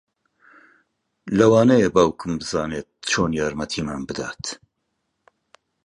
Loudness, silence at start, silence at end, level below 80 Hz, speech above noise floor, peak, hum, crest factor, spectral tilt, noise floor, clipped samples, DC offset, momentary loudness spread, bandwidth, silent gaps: -21 LUFS; 1.25 s; 1.3 s; -48 dBFS; 55 dB; -2 dBFS; none; 20 dB; -5 dB/octave; -75 dBFS; under 0.1%; under 0.1%; 15 LU; 11 kHz; none